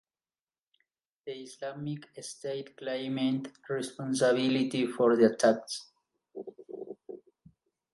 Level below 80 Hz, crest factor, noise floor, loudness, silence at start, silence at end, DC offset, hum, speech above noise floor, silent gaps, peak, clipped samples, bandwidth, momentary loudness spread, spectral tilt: -80 dBFS; 22 dB; under -90 dBFS; -30 LUFS; 1.25 s; 0.8 s; under 0.1%; none; over 60 dB; none; -10 dBFS; under 0.1%; 11.5 kHz; 22 LU; -5 dB/octave